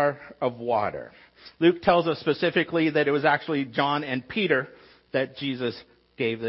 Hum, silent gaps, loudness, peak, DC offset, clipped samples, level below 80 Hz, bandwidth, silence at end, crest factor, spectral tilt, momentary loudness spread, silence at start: none; none; -25 LUFS; -8 dBFS; under 0.1%; under 0.1%; -62 dBFS; 5.8 kHz; 0 s; 18 dB; -9.5 dB/octave; 9 LU; 0 s